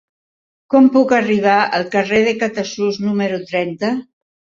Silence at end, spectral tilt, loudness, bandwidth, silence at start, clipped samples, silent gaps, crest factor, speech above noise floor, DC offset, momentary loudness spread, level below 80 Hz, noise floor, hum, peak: 0.55 s; -5.5 dB/octave; -16 LUFS; 7.6 kHz; 0.7 s; under 0.1%; none; 14 dB; over 75 dB; under 0.1%; 9 LU; -58 dBFS; under -90 dBFS; none; -2 dBFS